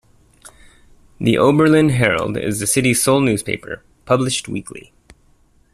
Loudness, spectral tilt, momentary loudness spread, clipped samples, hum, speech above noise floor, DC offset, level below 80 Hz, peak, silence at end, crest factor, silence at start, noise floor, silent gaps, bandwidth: -16 LUFS; -4.5 dB/octave; 16 LU; under 0.1%; none; 38 dB; under 0.1%; -48 dBFS; -2 dBFS; 0.95 s; 16 dB; 1.2 s; -54 dBFS; none; 14.5 kHz